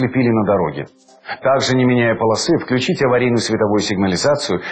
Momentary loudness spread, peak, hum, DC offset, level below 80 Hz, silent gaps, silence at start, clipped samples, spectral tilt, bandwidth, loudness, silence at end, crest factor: 6 LU; -6 dBFS; none; under 0.1%; -50 dBFS; none; 0 s; under 0.1%; -5 dB/octave; 9.2 kHz; -16 LUFS; 0 s; 12 dB